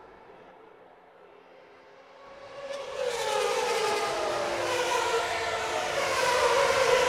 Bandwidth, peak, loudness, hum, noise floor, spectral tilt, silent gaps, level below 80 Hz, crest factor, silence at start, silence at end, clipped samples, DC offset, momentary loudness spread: 16 kHz; -12 dBFS; -27 LUFS; none; -54 dBFS; -1.5 dB/octave; none; -60 dBFS; 18 dB; 0 s; 0 s; under 0.1%; under 0.1%; 14 LU